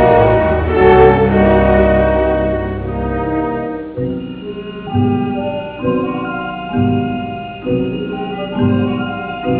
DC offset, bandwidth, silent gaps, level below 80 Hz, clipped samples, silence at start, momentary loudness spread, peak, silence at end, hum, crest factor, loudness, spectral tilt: under 0.1%; 4 kHz; none; -28 dBFS; under 0.1%; 0 s; 12 LU; 0 dBFS; 0 s; none; 14 dB; -15 LUFS; -11.5 dB/octave